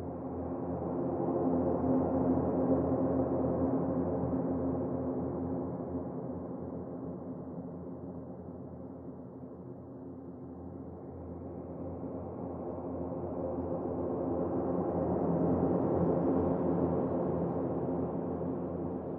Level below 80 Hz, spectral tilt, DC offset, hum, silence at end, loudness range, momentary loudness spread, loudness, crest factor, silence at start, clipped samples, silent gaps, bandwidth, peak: -56 dBFS; -12.5 dB/octave; under 0.1%; none; 0 s; 14 LU; 15 LU; -34 LUFS; 18 dB; 0 s; under 0.1%; none; 2.7 kHz; -16 dBFS